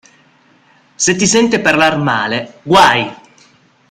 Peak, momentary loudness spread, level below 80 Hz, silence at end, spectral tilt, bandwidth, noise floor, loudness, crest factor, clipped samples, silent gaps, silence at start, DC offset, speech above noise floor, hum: 0 dBFS; 9 LU; -48 dBFS; 0.75 s; -3 dB/octave; 16 kHz; -50 dBFS; -12 LUFS; 14 dB; under 0.1%; none; 1 s; under 0.1%; 38 dB; none